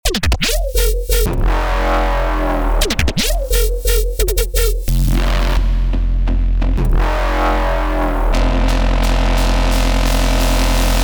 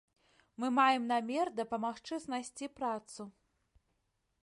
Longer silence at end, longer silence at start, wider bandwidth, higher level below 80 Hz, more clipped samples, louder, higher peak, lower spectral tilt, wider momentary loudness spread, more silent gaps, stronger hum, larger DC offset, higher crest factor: second, 0 s vs 1.15 s; second, 0.05 s vs 0.6 s; first, over 20 kHz vs 11.5 kHz; first, -16 dBFS vs -76 dBFS; neither; first, -17 LUFS vs -35 LUFS; first, 0 dBFS vs -16 dBFS; about the same, -4.5 dB/octave vs -3.5 dB/octave; second, 2 LU vs 16 LU; neither; neither; neither; second, 14 dB vs 20 dB